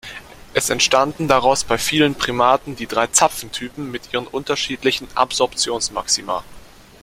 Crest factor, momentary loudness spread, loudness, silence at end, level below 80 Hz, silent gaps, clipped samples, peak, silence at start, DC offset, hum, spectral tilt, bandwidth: 20 dB; 12 LU; -18 LUFS; 0.35 s; -46 dBFS; none; under 0.1%; 0 dBFS; 0.05 s; under 0.1%; none; -2.5 dB/octave; 16 kHz